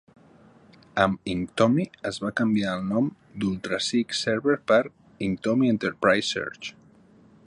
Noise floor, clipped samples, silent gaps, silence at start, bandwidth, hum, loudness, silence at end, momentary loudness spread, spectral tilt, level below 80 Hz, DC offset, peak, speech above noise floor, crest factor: -55 dBFS; under 0.1%; none; 0.95 s; 11 kHz; none; -25 LUFS; 0.75 s; 9 LU; -5 dB/octave; -58 dBFS; under 0.1%; -6 dBFS; 30 dB; 20 dB